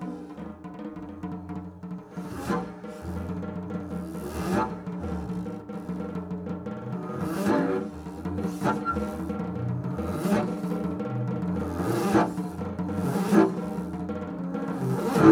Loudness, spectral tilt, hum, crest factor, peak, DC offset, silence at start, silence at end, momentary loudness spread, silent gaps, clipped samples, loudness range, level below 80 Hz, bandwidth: -30 LUFS; -7.5 dB/octave; none; 24 dB; -4 dBFS; under 0.1%; 0 s; 0 s; 14 LU; none; under 0.1%; 8 LU; -50 dBFS; 17 kHz